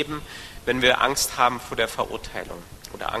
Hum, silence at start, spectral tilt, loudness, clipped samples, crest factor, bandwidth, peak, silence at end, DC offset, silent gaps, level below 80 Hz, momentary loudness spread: none; 0 s; -2.5 dB/octave; -23 LUFS; under 0.1%; 22 dB; 13.5 kHz; -2 dBFS; 0 s; under 0.1%; none; -46 dBFS; 19 LU